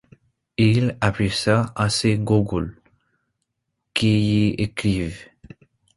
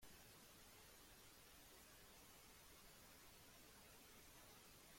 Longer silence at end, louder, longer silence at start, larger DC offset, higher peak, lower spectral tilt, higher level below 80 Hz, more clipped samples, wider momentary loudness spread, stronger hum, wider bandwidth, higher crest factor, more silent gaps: first, 0.75 s vs 0 s; first, -21 LUFS vs -64 LUFS; first, 0.6 s vs 0 s; neither; first, -2 dBFS vs -50 dBFS; first, -6 dB/octave vs -2 dB/octave; first, -44 dBFS vs -76 dBFS; neither; first, 9 LU vs 1 LU; neither; second, 11.5 kHz vs 16.5 kHz; first, 20 dB vs 14 dB; neither